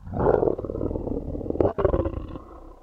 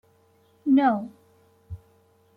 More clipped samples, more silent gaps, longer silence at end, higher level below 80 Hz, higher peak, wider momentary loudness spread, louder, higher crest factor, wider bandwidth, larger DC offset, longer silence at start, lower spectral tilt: neither; neither; second, 0.05 s vs 0.6 s; first, -36 dBFS vs -60 dBFS; first, -4 dBFS vs -10 dBFS; second, 16 LU vs 24 LU; second, -26 LUFS vs -23 LUFS; about the same, 20 dB vs 18 dB; first, 5.2 kHz vs 4.5 kHz; neither; second, 0 s vs 0.65 s; first, -11 dB/octave vs -8.5 dB/octave